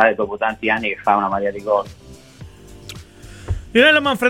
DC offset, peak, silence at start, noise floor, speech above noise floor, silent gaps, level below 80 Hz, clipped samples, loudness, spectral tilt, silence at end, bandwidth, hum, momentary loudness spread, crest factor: 0.1%; 0 dBFS; 0 s; -40 dBFS; 23 dB; none; -40 dBFS; under 0.1%; -17 LUFS; -5 dB/octave; 0 s; 17 kHz; none; 24 LU; 20 dB